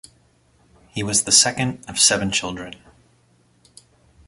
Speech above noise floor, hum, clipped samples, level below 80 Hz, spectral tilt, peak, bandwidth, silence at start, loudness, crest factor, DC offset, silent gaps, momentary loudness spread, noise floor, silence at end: 39 dB; none; under 0.1%; -52 dBFS; -1.5 dB/octave; 0 dBFS; 12 kHz; 0.95 s; -17 LUFS; 24 dB; under 0.1%; none; 19 LU; -59 dBFS; 1.55 s